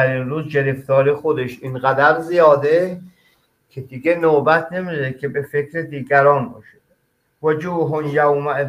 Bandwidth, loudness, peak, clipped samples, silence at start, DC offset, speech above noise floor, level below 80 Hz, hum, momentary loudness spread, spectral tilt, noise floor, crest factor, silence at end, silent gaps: 15 kHz; -17 LUFS; 0 dBFS; under 0.1%; 0 s; under 0.1%; 47 dB; -60 dBFS; none; 12 LU; -7.5 dB/octave; -65 dBFS; 18 dB; 0 s; none